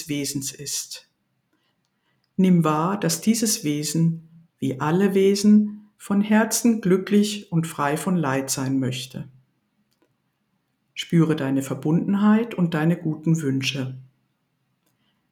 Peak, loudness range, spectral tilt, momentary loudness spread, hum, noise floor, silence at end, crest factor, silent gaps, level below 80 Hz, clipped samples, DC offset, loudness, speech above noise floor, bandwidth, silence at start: -6 dBFS; 6 LU; -5.5 dB/octave; 14 LU; none; -72 dBFS; 1.3 s; 16 dB; none; -68 dBFS; under 0.1%; under 0.1%; -22 LUFS; 51 dB; 17.5 kHz; 0 s